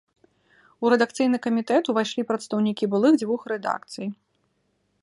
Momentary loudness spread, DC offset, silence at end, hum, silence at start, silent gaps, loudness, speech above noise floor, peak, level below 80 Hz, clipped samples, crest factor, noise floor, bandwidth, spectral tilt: 10 LU; under 0.1%; 0.9 s; none; 0.8 s; none; -24 LUFS; 48 dB; -6 dBFS; -74 dBFS; under 0.1%; 20 dB; -71 dBFS; 11.5 kHz; -5.5 dB/octave